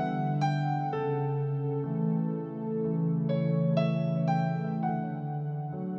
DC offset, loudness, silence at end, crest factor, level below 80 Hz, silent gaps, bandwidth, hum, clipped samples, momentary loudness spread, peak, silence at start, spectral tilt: under 0.1%; -30 LUFS; 0 s; 14 dB; -74 dBFS; none; 6 kHz; none; under 0.1%; 7 LU; -14 dBFS; 0 s; -9.5 dB/octave